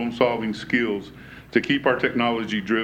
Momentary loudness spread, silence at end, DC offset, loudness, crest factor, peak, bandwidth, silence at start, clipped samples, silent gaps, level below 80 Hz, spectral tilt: 9 LU; 0 s; under 0.1%; -23 LUFS; 18 dB; -4 dBFS; 9.2 kHz; 0 s; under 0.1%; none; -54 dBFS; -6 dB/octave